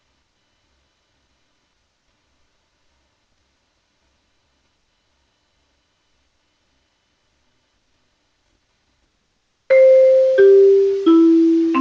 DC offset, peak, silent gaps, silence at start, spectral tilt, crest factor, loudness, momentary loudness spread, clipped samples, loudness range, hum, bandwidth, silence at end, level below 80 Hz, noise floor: under 0.1%; -4 dBFS; none; 9.7 s; -5.5 dB/octave; 16 dB; -12 LUFS; 5 LU; under 0.1%; 6 LU; none; 6.8 kHz; 0 s; -68 dBFS; -67 dBFS